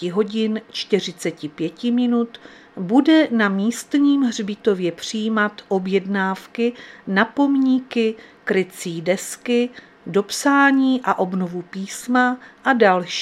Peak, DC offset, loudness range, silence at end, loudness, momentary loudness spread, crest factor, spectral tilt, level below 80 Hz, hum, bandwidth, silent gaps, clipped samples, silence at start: -2 dBFS; under 0.1%; 2 LU; 0 s; -20 LUFS; 12 LU; 18 dB; -5 dB/octave; -68 dBFS; none; 14.5 kHz; none; under 0.1%; 0 s